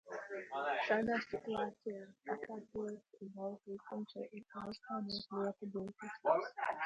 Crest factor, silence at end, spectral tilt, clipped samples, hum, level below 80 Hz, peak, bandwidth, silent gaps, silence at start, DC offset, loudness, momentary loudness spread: 22 dB; 0 s; -6 dB/octave; under 0.1%; none; -76 dBFS; -18 dBFS; 10 kHz; none; 0.05 s; under 0.1%; -41 LUFS; 13 LU